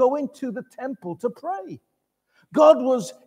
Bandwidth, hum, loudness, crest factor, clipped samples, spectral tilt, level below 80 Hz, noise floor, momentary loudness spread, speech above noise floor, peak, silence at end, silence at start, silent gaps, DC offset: 11.5 kHz; none; -22 LUFS; 20 dB; under 0.1%; -5.5 dB/octave; -76 dBFS; -69 dBFS; 17 LU; 47 dB; -2 dBFS; 0.15 s; 0 s; none; under 0.1%